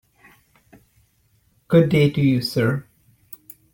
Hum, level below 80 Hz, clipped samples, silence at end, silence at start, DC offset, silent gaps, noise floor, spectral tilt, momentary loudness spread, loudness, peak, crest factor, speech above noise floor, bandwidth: none; -54 dBFS; under 0.1%; 0.9 s; 1.7 s; under 0.1%; none; -62 dBFS; -7.5 dB/octave; 24 LU; -19 LUFS; -2 dBFS; 20 dB; 45 dB; 16.5 kHz